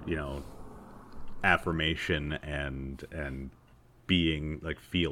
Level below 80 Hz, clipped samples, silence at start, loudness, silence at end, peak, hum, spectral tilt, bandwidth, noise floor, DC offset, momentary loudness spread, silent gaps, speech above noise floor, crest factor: -44 dBFS; under 0.1%; 0 s; -31 LUFS; 0 s; -8 dBFS; none; -6 dB/octave; 16 kHz; -59 dBFS; under 0.1%; 23 LU; none; 27 dB; 24 dB